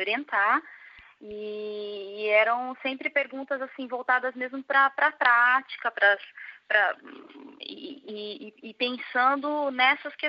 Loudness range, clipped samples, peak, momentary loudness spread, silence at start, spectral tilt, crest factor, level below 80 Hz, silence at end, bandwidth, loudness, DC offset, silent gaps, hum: 5 LU; under 0.1%; -6 dBFS; 18 LU; 0 s; 1.5 dB/octave; 22 dB; -80 dBFS; 0 s; 5.6 kHz; -25 LUFS; under 0.1%; none; none